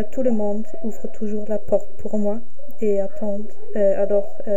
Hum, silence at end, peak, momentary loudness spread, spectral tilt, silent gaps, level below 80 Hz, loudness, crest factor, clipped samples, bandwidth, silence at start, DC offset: none; 0 s; -6 dBFS; 11 LU; -9 dB/octave; none; -54 dBFS; -24 LUFS; 16 dB; under 0.1%; 15.5 kHz; 0 s; 20%